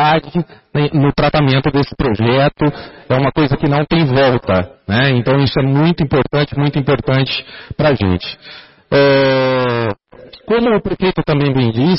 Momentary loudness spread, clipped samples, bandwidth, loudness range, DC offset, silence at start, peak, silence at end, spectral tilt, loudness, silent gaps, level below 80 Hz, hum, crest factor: 8 LU; under 0.1%; 5.8 kHz; 2 LU; under 0.1%; 0 s; -2 dBFS; 0 s; -10.5 dB/octave; -14 LUFS; none; -36 dBFS; none; 12 dB